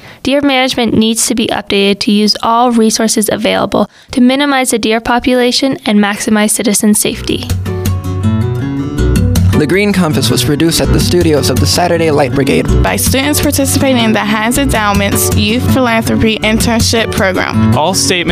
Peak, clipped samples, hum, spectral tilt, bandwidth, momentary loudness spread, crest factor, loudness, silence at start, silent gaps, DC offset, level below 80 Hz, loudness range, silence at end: 0 dBFS; under 0.1%; none; -4.5 dB/octave; 16 kHz; 4 LU; 10 dB; -10 LUFS; 0.05 s; none; under 0.1%; -26 dBFS; 2 LU; 0 s